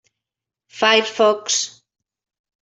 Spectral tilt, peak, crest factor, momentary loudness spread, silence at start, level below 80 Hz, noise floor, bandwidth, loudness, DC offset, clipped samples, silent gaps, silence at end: -0.5 dB/octave; -2 dBFS; 20 dB; 6 LU; 0.75 s; -72 dBFS; -86 dBFS; 8.2 kHz; -17 LUFS; under 0.1%; under 0.1%; none; 1 s